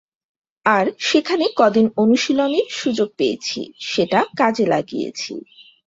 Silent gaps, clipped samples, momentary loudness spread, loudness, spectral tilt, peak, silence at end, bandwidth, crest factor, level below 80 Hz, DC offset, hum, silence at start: none; under 0.1%; 10 LU; -19 LUFS; -4.5 dB/octave; -2 dBFS; 0.25 s; 7.8 kHz; 18 dB; -62 dBFS; under 0.1%; none; 0.65 s